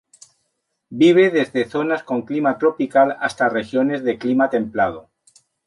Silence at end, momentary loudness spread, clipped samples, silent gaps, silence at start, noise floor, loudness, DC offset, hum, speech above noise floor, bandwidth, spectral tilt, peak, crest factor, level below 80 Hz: 0.65 s; 8 LU; under 0.1%; none; 0.9 s; -73 dBFS; -18 LUFS; under 0.1%; none; 55 dB; 11.5 kHz; -6 dB/octave; -4 dBFS; 16 dB; -60 dBFS